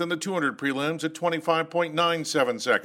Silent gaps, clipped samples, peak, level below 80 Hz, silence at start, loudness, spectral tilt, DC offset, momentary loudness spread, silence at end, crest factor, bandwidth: none; under 0.1%; -8 dBFS; -74 dBFS; 0 s; -26 LUFS; -4 dB/octave; under 0.1%; 4 LU; 0 s; 18 dB; 16 kHz